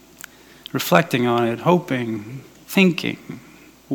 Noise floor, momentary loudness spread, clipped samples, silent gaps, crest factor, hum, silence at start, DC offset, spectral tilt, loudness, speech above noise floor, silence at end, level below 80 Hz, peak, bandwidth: -43 dBFS; 23 LU; under 0.1%; none; 22 dB; none; 0.75 s; under 0.1%; -5.5 dB/octave; -20 LUFS; 24 dB; 0 s; -62 dBFS; 0 dBFS; 19 kHz